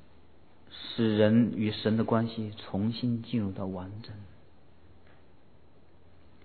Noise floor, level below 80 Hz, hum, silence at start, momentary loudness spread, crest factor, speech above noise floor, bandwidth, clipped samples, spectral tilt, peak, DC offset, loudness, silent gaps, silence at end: -60 dBFS; -66 dBFS; none; 0.7 s; 20 LU; 22 dB; 32 dB; 4.5 kHz; under 0.1%; -10.5 dB/octave; -10 dBFS; 0.3%; -29 LUFS; none; 2.2 s